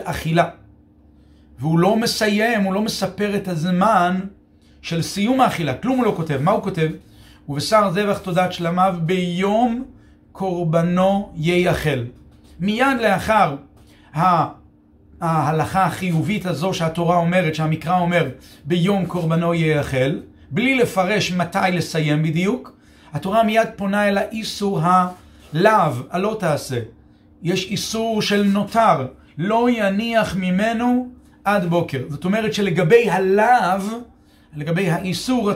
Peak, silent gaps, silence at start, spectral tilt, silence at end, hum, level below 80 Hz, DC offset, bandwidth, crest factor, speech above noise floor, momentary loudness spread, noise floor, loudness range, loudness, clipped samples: 0 dBFS; none; 0 s; -6 dB/octave; 0 s; none; -48 dBFS; under 0.1%; 16 kHz; 18 dB; 32 dB; 10 LU; -50 dBFS; 2 LU; -19 LUFS; under 0.1%